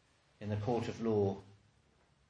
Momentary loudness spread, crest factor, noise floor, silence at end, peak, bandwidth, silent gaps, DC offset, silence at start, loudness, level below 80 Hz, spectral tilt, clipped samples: 13 LU; 18 dB; -70 dBFS; 0.75 s; -20 dBFS; 10 kHz; none; under 0.1%; 0.4 s; -36 LUFS; -68 dBFS; -8 dB/octave; under 0.1%